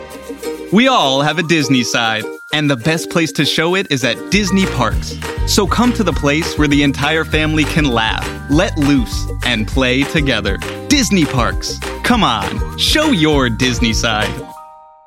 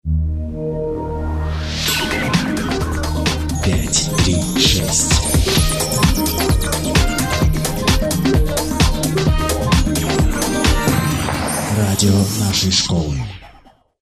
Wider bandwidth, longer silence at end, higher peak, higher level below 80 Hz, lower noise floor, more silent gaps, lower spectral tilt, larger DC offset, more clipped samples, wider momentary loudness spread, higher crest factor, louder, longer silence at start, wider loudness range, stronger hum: first, 16.5 kHz vs 14 kHz; second, 0.3 s vs 0.5 s; about the same, 0 dBFS vs 0 dBFS; about the same, -26 dBFS vs -24 dBFS; second, -38 dBFS vs -48 dBFS; neither; about the same, -4.5 dB/octave vs -4 dB/octave; neither; neither; about the same, 9 LU vs 8 LU; about the same, 14 dB vs 16 dB; first, -14 LUFS vs -17 LUFS; about the same, 0 s vs 0.05 s; about the same, 1 LU vs 3 LU; neither